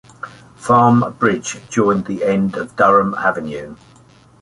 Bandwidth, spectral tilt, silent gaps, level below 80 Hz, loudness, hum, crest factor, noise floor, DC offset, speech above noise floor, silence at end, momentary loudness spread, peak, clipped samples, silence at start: 11 kHz; -6 dB/octave; none; -52 dBFS; -16 LUFS; none; 16 dB; -47 dBFS; under 0.1%; 32 dB; 0.65 s; 19 LU; -2 dBFS; under 0.1%; 0.25 s